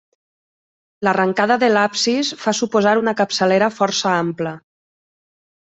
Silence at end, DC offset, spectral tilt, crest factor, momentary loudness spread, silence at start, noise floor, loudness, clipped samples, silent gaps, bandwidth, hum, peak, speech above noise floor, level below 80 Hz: 1.05 s; under 0.1%; -4 dB/octave; 16 dB; 6 LU; 1 s; under -90 dBFS; -17 LUFS; under 0.1%; none; 8.4 kHz; none; -2 dBFS; over 73 dB; -64 dBFS